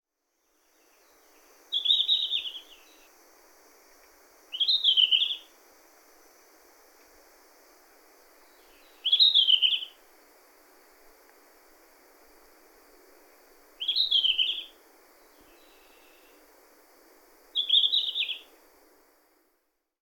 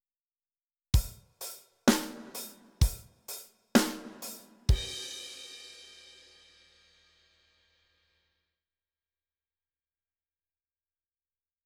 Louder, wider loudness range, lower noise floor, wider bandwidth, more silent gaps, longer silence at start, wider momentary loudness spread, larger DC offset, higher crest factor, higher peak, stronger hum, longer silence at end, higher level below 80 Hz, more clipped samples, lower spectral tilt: first, -23 LUFS vs -32 LUFS; second, 7 LU vs 16 LU; second, -76 dBFS vs under -90 dBFS; second, 18 kHz vs 20 kHz; neither; first, 1.7 s vs 0.95 s; about the same, 18 LU vs 20 LU; neither; second, 22 dB vs 28 dB; about the same, -10 dBFS vs -8 dBFS; neither; second, 1.6 s vs 5.8 s; second, -74 dBFS vs -40 dBFS; neither; second, 2.5 dB/octave vs -4.5 dB/octave